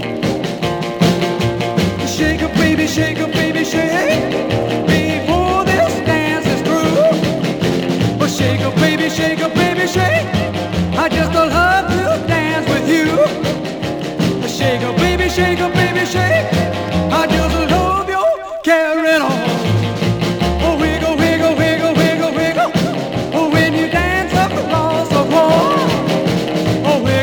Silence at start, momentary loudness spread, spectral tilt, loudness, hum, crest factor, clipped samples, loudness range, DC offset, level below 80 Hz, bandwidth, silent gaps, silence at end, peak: 0 s; 4 LU; -5.5 dB/octave; -15 LUFS; none; 14 dB; under 0.1%; 1 LU; under 0.1%; -34 dBFS; over 20 kHz; none; 0 s; 0 dBFS